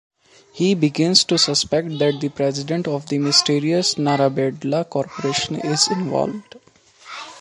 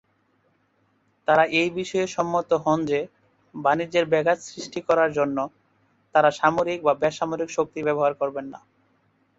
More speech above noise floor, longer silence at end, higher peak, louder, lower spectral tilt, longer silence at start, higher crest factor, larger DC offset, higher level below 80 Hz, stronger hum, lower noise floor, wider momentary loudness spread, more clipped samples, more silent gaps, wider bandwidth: second, 24 dB vs 44 dB; second, 0 s vs 0.8 s; first, 0 dBFS vs -4 dBFS; first, -19 LUFS vs -23 LUFS; about the same, -4 dB/octave vs -5 dB/octave; second, 0.55 s vs 1.3 s; about the same, 20 dB vs 20 dB; neither; about the same, -60 dBFS vs -64 dBFS; neither; second, -44 dBFS vs -67 dBFS; about the same, 9 LU vs 11 LU; neither; neither; first, 11.5 kHz vs 8 kHz